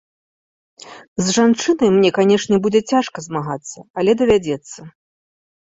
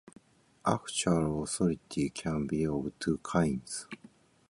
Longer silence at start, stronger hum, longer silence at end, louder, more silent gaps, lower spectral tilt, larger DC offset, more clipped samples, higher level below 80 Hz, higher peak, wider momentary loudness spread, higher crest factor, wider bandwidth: first, 0.85 s vs 0.65 s; neither; first, 0.7 s vs 0.4 s; first, -17 LUFS vs -32 LUFS; first, 1.08-1.16 s, 3.90-3.94 s vs none; about the same, -5 dB/octave vs -5.5 dB/octave; neither; neither; about the same, -52 dBFS vs -54 dBFS; first, -2 dBFS vs -12 dBFS; first, 15 LU vs 9 LU; about the same, 16 dB vs 20 dB; second, 8 kHz vs 11.5 kHz